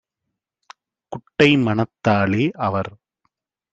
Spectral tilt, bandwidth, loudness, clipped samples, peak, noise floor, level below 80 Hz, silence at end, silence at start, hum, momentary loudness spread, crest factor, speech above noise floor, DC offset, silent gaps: -7 dB/octave; 8.4 kHz; -19 LUFS; under 0.1%; -2 dBFS; -81 dBFS; -58 dBFS; 0.85 s; 1.1 s; none; 18 LU; 20 dB; 62 dB; under 0.1%; none